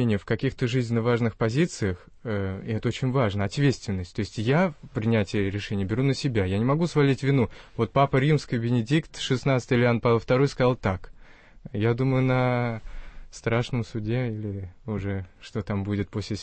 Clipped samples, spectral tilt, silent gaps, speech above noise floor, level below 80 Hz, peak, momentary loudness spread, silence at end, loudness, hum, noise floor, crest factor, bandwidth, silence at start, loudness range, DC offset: under 0.1%; -7 dB/octave; none; 24 dB; -48 dBFS; -10 dBFS; 10 LU; 0 s; -26 LUFS; none; -49 dBFS; 16 dB; 8.8 kHz; 0 s; 4 LU; under 0.1%